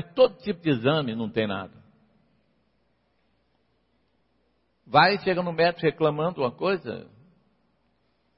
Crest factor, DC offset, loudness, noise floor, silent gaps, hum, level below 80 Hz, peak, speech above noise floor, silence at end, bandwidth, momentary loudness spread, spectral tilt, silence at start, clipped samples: 22 dB; under 0.1%; -24 LUFS; -70 dBFS; none; none; -66 dBFS; -4 dBFS; 46 dB; 1.35 s; 5.8 kHz; 11 LU; -10 dB/octave; 0 s; under 0.1%